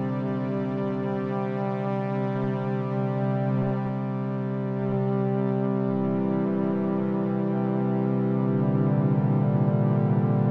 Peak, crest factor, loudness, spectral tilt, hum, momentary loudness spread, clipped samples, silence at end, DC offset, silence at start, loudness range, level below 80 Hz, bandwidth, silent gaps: -12 dBFS; 14 dB; -26 LUFS; -11.5 dB/octave; none; 5 LU; under 0.1%; 0 s; under 0.1%; 0 s; 3 LU; -66 dBFS; 4.7 kHz; none